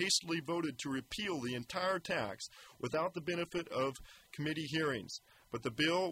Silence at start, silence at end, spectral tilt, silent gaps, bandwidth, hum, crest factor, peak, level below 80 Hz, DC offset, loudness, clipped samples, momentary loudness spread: 0 s; 0 s; -3.5 dB/octave; none; 16 kHz; none; 18 dB; -20 dBFS; -68 dBFS; under 0.1%; -38 LUFS; under 0.1%; 14 LU